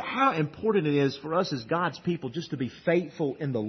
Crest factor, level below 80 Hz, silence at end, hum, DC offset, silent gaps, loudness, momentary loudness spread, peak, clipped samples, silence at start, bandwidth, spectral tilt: 16 dB; -66 dBFS; 0 s; none; under 0.1%; none; -28 LUFS; 8 LU; -12 dBFS; under 0.1%; 0 s; 6.4 kHz; -7 dB/octave